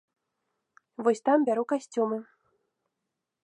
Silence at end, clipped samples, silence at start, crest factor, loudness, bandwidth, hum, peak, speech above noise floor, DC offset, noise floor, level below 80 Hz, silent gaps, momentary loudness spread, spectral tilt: 1.2 s; under 0.1%; 1 s; 20 dB; -27 LUFS; 10.5 kHz; none; -12 dBFS; 59 dB; under 0.1%; -85 dBFS; -88 dBFS; none; 10 LU; -5.5 dB/octave